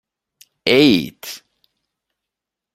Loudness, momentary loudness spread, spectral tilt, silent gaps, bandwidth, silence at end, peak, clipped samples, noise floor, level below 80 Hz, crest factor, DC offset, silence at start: -15 LUFS; 20 LU; -5 dB/octave; none; 16 kHz; 1.4 s; -2 dBFS; under 0.1%; -84 dBFS; -58 dBFS; 20 dB; under 0.1%; 0.65 s